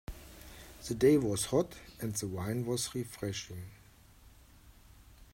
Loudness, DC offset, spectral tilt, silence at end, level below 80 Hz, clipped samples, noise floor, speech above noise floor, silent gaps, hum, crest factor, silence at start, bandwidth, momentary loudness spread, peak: -33 LUFS; under 0.1%; -5 dB/octave; 0.1 s; -56 dBFS; under 0.1%; -59 dBFS; 26 dB; none; none; 20 dB; 0.1 s; 16 kHz; 24 LU; -14 dBFS